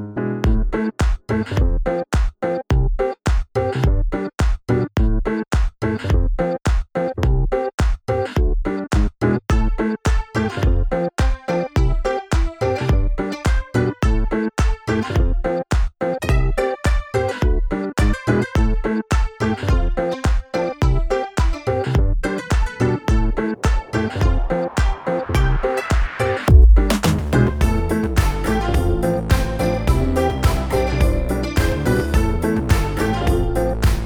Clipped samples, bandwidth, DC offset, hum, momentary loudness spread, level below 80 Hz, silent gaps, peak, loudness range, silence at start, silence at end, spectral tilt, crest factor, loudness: under 0.1%; 16 kHz; under 0.1%; none; 4 LU; -20 dBFS; 7.74-7.78 s; 0 dBFS; 4 LU; 0 s; 0 s; -6.5 dB/octave; 18 dB; -20 LUFS